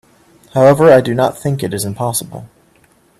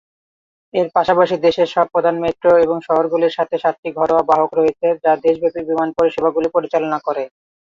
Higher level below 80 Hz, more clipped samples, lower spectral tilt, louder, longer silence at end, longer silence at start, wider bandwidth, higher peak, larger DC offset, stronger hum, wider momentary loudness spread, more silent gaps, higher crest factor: first, -50 dBFS vs -56 dBFS; neither; about the same, -5.5 dB/octave vs -6.5 dB/octave; first, -13 LUFS vs -17 LUFS; first, 0.75 s vs 0.45 s; second, 0.55 s vs 0.75 s; first, 14 kHz vs 7.2 kHz; about the same, 0 dBFS vs -2 dBFS; neither; neither; first, 13 LU vs 6 LU; second, none vs 3.78-3.83 s; about the same, 14 dB vs 16 dB